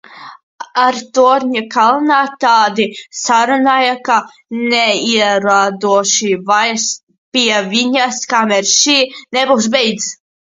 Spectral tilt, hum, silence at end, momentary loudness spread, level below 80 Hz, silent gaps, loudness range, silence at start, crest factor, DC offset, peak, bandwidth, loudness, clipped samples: -2 dB/octave; none; 0.3 s; 8 LU; -64 dBFS; 0.43-0.58 s, 7.03-7.07 s, 7.18-7.32 s; 1 LU; 0.1 s; 14 dB; under 0.1%; 0 dBFS; 7.8 kHz; -13 LUFS; under 0.1%